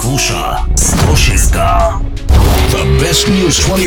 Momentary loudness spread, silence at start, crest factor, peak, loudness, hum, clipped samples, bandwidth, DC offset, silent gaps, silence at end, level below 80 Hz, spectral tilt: 5 LU; 0 s; 10 dB; 0 dBFS; -11 LUFS; none; under 0.1%; 19 kHz; under 0.1%; none; 0 s; -14 dBFS; -4 dB/octave